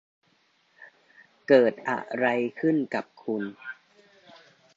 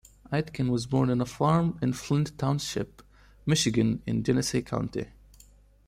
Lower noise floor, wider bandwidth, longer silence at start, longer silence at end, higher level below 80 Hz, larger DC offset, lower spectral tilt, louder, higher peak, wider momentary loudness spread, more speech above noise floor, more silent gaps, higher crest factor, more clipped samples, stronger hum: first, -67 dBFS vs -56 dBFS; second, 7.8 kHz vs 15.5 kHz; first, 0.8 s vs 0.3 s; first, 1.05 s vs 0.8 s; second, -78 dBFS vs -52 dBFS; neither; first, -7 dB/octave vs -5.5 dB/octave; about the same, -26 LUFS vs -28 LUFS; first, -6 dBFS vs -10 dBFS; first, 21 LU vs 10 LU; first, 42 dB vs 29 dB; neither; about the same, 22 dB vs 18 dB; neither; neither